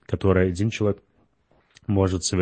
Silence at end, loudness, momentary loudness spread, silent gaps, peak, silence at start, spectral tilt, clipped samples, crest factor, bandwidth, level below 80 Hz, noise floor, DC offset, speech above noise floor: 0 s; -23 LUFS; 10 LU; none; -4 dBFS; 0.1 s; -6 dB/octave; under 0.1%; 20 dB; 8.8 kHz; -46 dBFS; -63 dBFS; under 0.1%; 42 dB